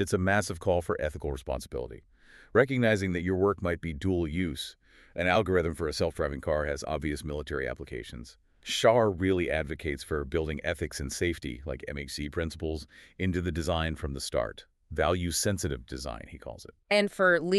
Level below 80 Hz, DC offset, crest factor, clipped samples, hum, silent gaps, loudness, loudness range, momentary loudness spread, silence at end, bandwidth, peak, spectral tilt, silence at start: -44 dBFS; under 0.1%; 22 dB; under 0.1%; none; none; -30 LUFS; 4 LU; 14 LU; 0 s; 13.5 kHz; -8 dBFS; -5 dB/octave; 0 s